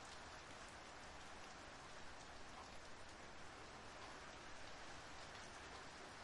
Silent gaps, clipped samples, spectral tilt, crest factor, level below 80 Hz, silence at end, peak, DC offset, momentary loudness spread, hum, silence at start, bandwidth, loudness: none; under 0.1%; -2.5 dB/octave; 14 dB; -70 dBFS; 0 s; -42 dBFS; under 0.1%; 2 LU; none; 0 s; 11.5 kHz; -56 LUFS